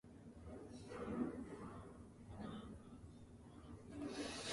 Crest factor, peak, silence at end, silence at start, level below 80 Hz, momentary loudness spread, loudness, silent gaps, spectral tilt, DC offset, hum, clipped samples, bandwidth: 20 dB; -30 dBFS; 0 s; 0.05 s; -64 dBFS; 14 LU; -52 LUFS; none; -5 dB/octave; under 0.1%; none; under 0.1%; 11.5 kHz